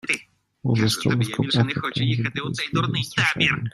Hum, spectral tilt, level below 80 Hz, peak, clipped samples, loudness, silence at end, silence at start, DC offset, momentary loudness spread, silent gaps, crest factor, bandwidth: none; -5 dB/octave; -54 dBFS; -4 dBFS; under 0.1%; -23 LUFS; 0.05 s; 0.05 s; under 0.1%; 6 LU; none; 18 dB; 14.5 kHz